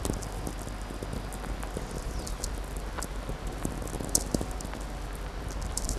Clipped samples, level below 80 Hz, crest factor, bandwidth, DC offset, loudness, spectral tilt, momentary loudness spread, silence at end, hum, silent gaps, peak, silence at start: under 0.1%; -36 dBFS; 30 dB; 14.5 kHz; under 0.1%; -35 LUFS; -4 dB/octave; 10 LU; 0 s; none; none; -4 dBFS; 0 s